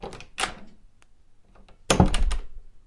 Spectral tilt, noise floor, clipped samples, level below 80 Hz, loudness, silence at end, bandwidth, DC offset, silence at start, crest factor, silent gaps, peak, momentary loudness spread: -4.5 dB/octave; -52 dBFS; under 0.1%; -32 dBFS; -26 LUFS; 0.1 s; 11.5 kHz; under 0.1%; 0 s; 24 dB; none; -2 dBFS; 16 LU